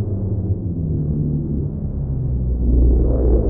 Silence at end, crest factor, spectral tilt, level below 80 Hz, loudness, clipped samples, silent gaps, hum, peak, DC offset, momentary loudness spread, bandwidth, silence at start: 0 s; 12 dB; -16.5 dB/octave; -20 dBFS; -20 LUFS; under 0.1%; none; none; -6 dBFS; under 0.1%; 7 LU; 1.5 kHz; 0 s